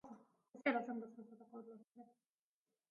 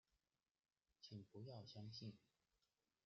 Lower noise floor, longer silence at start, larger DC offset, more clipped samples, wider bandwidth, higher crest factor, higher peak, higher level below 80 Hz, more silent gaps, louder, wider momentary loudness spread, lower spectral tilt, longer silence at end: about the same, under -90 dBFS vs under -90 dBFS; second, 0.05 s vs 1 s; neither; neither; about the same, 6.8 kHz vs 7.2 kHz; first, 26 dB vs 18 dB; first, -22 dBFS vs -44 dBFS; about the same, under -90 dBFS vs -90 dBFS; neither; first, -43 LUFS vs -59 LUFS; first, 24 LU vs 5 LU; second, -3 dB/octave vs -6 dB/octave; about the same, 0.85 s vs 0.85 s